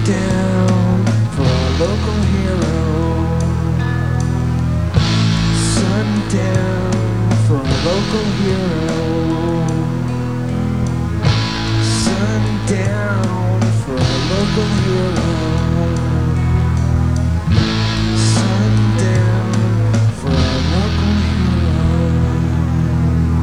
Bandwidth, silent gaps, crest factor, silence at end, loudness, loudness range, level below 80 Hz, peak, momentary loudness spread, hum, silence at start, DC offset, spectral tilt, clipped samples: 11.5 kHz; none; 14 dB; 0 s; -16 LUFS; 2 LU; -28 dBFS; 0 dBFS; 3 LU; none; 0 s; 2%; -6.5 dB/octave; under 0.1%